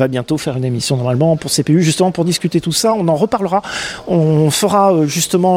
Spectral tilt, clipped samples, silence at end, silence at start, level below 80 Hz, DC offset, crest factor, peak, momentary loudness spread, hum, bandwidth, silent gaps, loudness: -5 dB/octave; under 0.1%; 0 s; 0 s; -48 dBFS; under 0.1%; 14 dB; 0 dBFS; 6 LU; none; 16.5 kHz; none; -14 LUFS